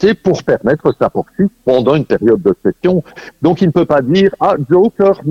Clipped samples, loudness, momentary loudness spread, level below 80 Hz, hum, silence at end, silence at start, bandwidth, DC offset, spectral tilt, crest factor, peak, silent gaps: under 0.1%; -13 LUFS; 5 LU; -44 dBFS; none; 0 s; 0 s; 7.2 kHz; under 0.1%; -8 dB/octave; 12 dB; 0 dBFS; none